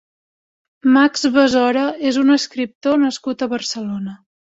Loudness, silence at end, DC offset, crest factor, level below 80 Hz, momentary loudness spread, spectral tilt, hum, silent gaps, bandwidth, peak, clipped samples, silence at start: -17 LUFS; 0.35 s; under 0.1%; 16 dB; -60 dBFS; 11 LU; -4 dB/octave; none; 2.75-2.81 s; 8 kHz; -2 dBFS; under 0.1%; 0.85 s